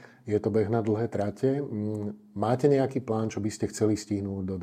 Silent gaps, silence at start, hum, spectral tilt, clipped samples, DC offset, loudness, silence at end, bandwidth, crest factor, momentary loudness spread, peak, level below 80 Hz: none; 0 s; none; -7 dB/octave; under 0.1%; under 0.1%; -28 LUFS; 0 s; 14.5 kHz; 18 dB; 8 LU; -10 dBFS; -66 dBFS